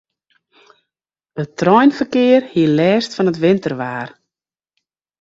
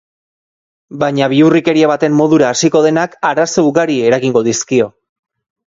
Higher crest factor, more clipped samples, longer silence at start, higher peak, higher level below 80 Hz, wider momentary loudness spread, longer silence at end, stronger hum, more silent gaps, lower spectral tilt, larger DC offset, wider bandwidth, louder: about the same, 16 dB vs 12 dB; neither; first, 1.35 s vs 0.9 s; about the same, 0 dBFS vs 0 dBFS; about the same, -58 dBFS vs -54 dBFS; first, 15 LU vs 5 LU; first, 1.15 s vs 0.85 s; neither; neither; first, -7 dB/octave vs -5 dB/octave; neither; about the same, 7.8 kHz vs 7.8 kHz; second, -15 LUFS vs -12 LUFS